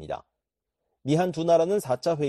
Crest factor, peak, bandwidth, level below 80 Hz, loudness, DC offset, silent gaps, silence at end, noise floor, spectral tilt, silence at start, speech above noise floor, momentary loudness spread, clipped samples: 16 dB; -10 dBFS; 13 kHz; -62 dBFS; -24 LUFS; under 0.1%; none; 0 s; -85 dBFS; -6.5 dB/octave; 0 s; 61 dB; 16 LU; under 0.1%